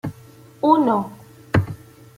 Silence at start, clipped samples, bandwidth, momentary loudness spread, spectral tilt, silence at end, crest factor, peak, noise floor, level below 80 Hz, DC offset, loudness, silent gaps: 0.05 s; under 0.1%; 16 kHz; 18 LU; -8 dB/octave; 0.4 s; 20 dB; -2 dBFS; -46 dBFS; -50 dBFS; under 0.1%; -20 LUFS; none